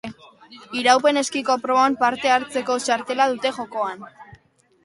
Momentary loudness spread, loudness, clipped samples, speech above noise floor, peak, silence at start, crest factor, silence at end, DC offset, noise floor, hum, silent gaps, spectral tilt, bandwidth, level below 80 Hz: 11 LU; -20 LUFS; under 0.1%; 36 dB; -2 dBFS; 0.05 s; 20 dB; 0.5 s; under 0.1%; -56 dBFS; none; none; -2 dB/octave; 11.5 kHz; -66 dBFS